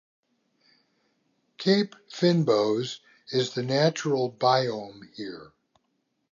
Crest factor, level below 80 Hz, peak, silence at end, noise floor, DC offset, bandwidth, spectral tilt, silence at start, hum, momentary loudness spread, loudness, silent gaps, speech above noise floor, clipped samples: 20 dB; -76 dBFS; -8 dBFS; 0.9 s; -75 dBFS; under 0.1%; 7.6 kHz; -5.5 dB/octave; 1.6 s; none; 16 LU; -25 LUFS; none; 50 dB; under 0.1%